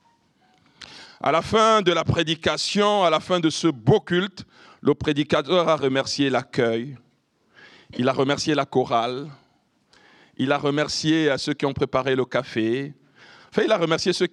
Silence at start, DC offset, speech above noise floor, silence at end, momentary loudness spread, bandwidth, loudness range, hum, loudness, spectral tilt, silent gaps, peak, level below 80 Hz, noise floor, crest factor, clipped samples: 0.8 s; under 0.1%; 43 dB; 0.05 s; 10 LU; 11.5 kHz; 4 LU; none; -22 LUFS; -5 dB/octave; none; -6 dBFS; -56 dBFS; -64 dBFS; 16 dB; under 0.1%